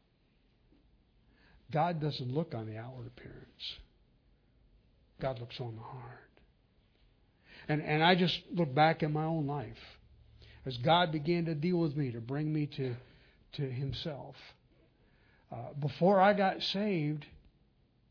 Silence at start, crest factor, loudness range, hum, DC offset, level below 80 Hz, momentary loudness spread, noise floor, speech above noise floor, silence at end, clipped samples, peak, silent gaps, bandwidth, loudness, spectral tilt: 1.7 s; 24 dB; 13 LU; none; under 0.1%; -64 dBFS; 22 LU; -70 dBFS; 38 dB; 0.75 s; under 0.1%; -10 dBFS; none; 5.4 kHz; -32 LUFS; -4.5 dB/octave